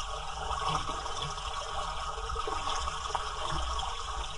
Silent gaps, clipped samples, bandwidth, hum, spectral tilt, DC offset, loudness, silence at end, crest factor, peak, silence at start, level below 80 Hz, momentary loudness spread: none; under 0.1%; 11.5 kHz; none; -2.5 dB/octave; under 0.1%; -35 LUFS; 0 s; 18 dB; -16 dBFS; 0 s; -40 dBFS; 4 LU